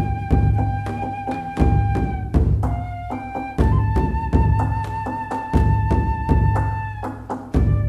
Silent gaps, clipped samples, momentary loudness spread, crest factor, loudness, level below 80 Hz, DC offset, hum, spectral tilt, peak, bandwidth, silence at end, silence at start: none; under 0.1%; 9 LU; 18 dB; -21 LUFS; -24 dBFS; under 0.1%; none; -9 dB/octave; -2 dBFS; 9.2 kHz; 0 s; 0 s